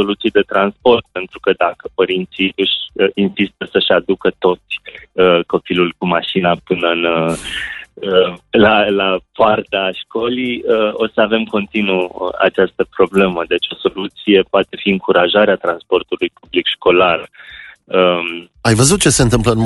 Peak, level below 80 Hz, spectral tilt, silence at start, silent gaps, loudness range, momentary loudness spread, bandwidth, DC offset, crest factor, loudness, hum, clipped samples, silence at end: 0 dBFS; -40 dBFS; -4.5 dB/octave; 0 s; none; 2 LU; 9 LU; 11.5 kHz; under 0.1%; 14 dB; -15 LUFS; none; under 0.1%; 0 s